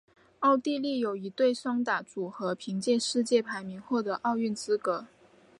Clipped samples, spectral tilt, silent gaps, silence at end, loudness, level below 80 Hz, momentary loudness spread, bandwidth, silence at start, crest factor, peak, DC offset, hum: under 0.1%; -4.5 dB/octave; none; 0.55 s; -30 LUFS; -78 dBFS; 8 LU; 11.5 kHz; 0.4 s; 18 dB; -12 dBFS; under 0.1%; none